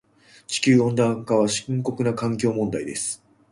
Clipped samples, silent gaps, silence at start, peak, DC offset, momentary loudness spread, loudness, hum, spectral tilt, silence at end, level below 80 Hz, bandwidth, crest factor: under 0.1%; none; 0.5 s; -6 dBFS; under 0.1%; 10 LU; -23 LUFS; none; -5 dB/octave; 0.35 s; -58 dBFS; 11.5 kHz; 18 dB